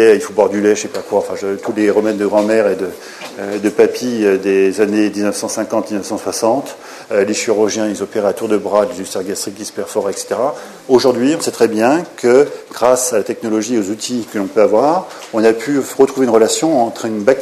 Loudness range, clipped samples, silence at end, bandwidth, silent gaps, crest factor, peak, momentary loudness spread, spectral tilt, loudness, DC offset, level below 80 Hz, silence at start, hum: 3 LU; under 0.1%; 0 s; 14 kHz; none; 14 dB; 0 dBFS; 9 LU; -4 dB/octave; -15 LUFS; under 0.1%; -60 dBFS; 0 s; none